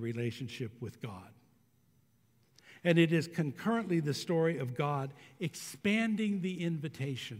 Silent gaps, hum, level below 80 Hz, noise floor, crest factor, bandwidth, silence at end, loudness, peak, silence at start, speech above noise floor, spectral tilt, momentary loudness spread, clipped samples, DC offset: none; none; -78 dBFS; -70 dBFS; 22 dB; 16 kHz; 0 s; -34 LUFS; -12 dBFS; 0 s; 37 dB; -6 dB/octave; 14 LU; under 0.1%; under 0.1%